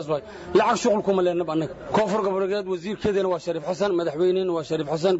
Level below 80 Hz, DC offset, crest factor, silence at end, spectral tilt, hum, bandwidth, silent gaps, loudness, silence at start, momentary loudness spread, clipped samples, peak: -56 dBFS; under 0.1%; 14 dB; 0 s; -5.5 dB/octave; none; 8 kHz; none; -24 LUFS; 0 s; 7 LU; under 0.1%; -8 dBFS